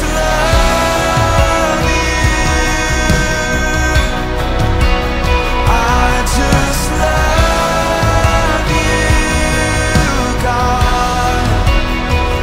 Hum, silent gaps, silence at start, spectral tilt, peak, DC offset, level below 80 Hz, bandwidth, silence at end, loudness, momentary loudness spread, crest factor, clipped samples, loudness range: none; none; 0 s; -4.5 dB/octave; 0 dBFS; under 0.1%; -16 dBFS; 16 kHz; 0 s; -13 LUFS; 3 LU; 12 dB; under 0.1%; 1 LU